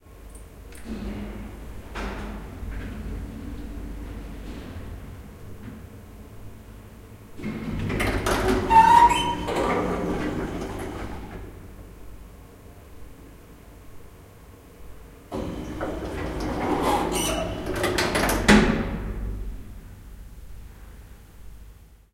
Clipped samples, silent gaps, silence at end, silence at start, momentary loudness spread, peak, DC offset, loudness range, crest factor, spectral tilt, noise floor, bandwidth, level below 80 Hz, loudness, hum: under 0.1%; none; 0.2 s; 0.05 s; 27 LU; 0 dBFS; under 0.1%; 20 LU; 26 dB; -4.5 dB/octave; -48 dBFS; 16.5 kHz; -38 dBFS; -24 LUFS; none